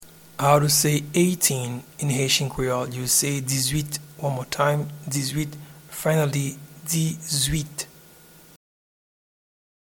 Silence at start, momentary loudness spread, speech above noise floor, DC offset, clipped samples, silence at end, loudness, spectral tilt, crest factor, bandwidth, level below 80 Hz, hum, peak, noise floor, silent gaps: 0 s; 13 LU; 27 dB; under 0.1%; under 0.1%; 2 s; -23 LUFS; -4 dB/octave; 20 dB; 19 kHz; -48 dBFS; none; -4 dBFS; -50 dBFS; none